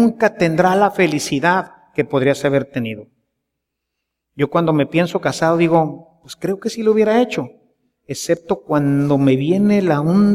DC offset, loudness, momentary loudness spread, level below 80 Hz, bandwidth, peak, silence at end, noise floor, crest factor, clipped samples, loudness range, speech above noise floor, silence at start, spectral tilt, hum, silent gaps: under 0.1%; -17 LUFS; 11 LU; -56 dBFS; 15 kHz; -2 dBFS; 0 s; -78 dBFS; 16 dB; under 0.1%; 3 LU; 62 dB; 0 s; -6.5 dB/octave; none; none